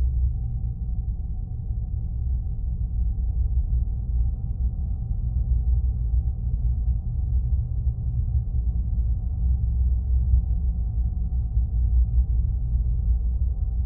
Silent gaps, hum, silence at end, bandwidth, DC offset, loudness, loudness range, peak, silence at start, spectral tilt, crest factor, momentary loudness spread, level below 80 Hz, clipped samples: none; none; 0 s; 0.8 kHz; under 0.1%; -27 LUFS; 3 LU; -10 dBFS; 0 s; -17.5 dB/octave; 14 dB; 6 LU; -24 dBFS; under 0.1%